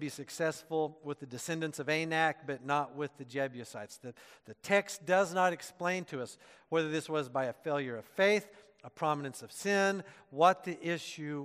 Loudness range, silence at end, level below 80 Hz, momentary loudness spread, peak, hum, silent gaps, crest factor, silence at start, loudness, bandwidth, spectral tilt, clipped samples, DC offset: 3 LU; 0 s; -82 dBFS; 14 LU; -12 dBFS; none; none; 22 dB; 0 s; -33 LUFS; 15.5 kHz; -4.5 dB/octave; under 0.1%; under 0.1%